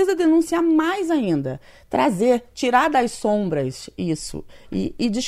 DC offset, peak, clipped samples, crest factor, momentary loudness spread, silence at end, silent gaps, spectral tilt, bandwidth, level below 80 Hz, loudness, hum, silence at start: under 0.1%; -4 dBFS; under 0.1%; 16 dB; 12 LU; 0 s; none; -5.5 dB/octave; 14.5 kHz; -48 dBFS; -21 LUFS; none; 0 s